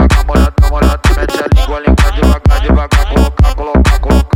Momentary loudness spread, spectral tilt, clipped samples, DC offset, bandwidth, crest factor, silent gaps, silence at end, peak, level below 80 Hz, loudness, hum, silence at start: 2 LU; -6.5 dB/octave; under 0.1%; under 0.1%; 16 kHz; 8 dB; none; 0 s; 0 dBFS; -10 dBFS; -11 LUFS; none; 0 s